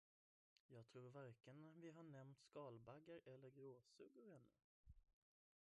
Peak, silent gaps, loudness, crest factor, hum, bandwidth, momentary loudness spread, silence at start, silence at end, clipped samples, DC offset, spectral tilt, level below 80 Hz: -46 dBFS; 4.64-4.84 s; -64 LUFS; 18 dB; none; 10 kHz; 7 LU; 0.7 s; 0.5 s; under 0.1%; under 0.1%; -7 dB/octave; -84 dBFS